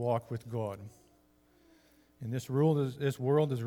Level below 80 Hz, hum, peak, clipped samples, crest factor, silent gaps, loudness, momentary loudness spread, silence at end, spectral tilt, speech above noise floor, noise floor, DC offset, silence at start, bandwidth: -72 dBFS; none; -16 dBFS; under 0.1%; 18 dB; none; -32 LUFS; 16 LU; 0 s; -8 dB/octave; 35 dB; -66 dBFS; under 0.1%; 0 s; 17 kHz